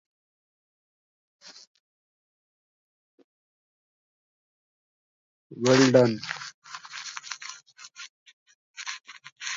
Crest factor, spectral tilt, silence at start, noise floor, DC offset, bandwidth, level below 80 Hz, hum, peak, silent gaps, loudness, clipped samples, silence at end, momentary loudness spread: 26 dB; -4.5 dB/octave; 1.45 s; -48 dBFS; under 0.1%; 7.8 kHz; -76 dBFS; none; -6 dBFS; 1.67-3.18 s, 3.24-5.50 s, 6.54-6.62 s, 8.09-8.26 s, 8.33-8.46 s, 8.55-8.74 s, 9.32-9.36 s; -25 LUFS; under 0.1%; 0 s; 28 LU